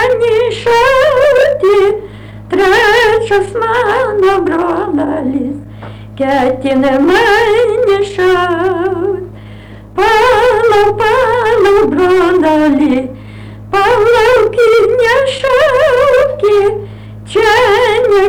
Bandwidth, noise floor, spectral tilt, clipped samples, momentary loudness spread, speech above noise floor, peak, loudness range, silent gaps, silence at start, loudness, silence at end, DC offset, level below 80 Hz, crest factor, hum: 19.5 kHz; -31 dBFS; -5 dB/octave; under 0.1%; 10 LU; 21 dB; -4 dBFS; 3 LU; none; 0 s; -10 LUFS; 0 s; under 0.1%; -36 dBFS; 6 dB; none